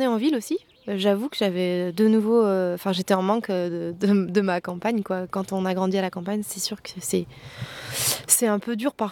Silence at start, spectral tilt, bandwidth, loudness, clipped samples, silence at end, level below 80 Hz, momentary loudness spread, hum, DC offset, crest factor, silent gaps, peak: 0 s; -4.5 dB/octave; 19 kHz; -24 LUFS; under 0.1%; 0 s; -64 dBFS; 10 LU; none; under 0.1%; 20 dB; none; -2 dBFS